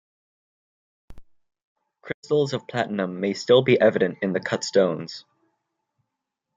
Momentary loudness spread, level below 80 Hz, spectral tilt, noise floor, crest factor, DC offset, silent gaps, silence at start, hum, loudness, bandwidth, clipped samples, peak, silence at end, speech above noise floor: 17 LU; -60 dBFS; -5.5 dB/octave; -83 dBFS; 20 dB; under 0.1%; 1.67-1.76 s, 2.14-2.23 s; 1.1 s; none; -22 LUFS; 7.8 kHz; under 0.1%; -6 dBFS; 1.35 s; 61 dB